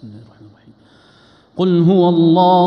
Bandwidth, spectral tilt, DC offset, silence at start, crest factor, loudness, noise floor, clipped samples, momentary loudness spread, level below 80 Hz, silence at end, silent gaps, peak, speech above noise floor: 5.6 kHz; -10 dB/octave; under 0.1%; 0.05 s; 14 dB; -13 LUFS; -49 dBFS; under 0.1%; 9 LU; -60 dBFS; 0 s; none; -2 dBFS; 38 dB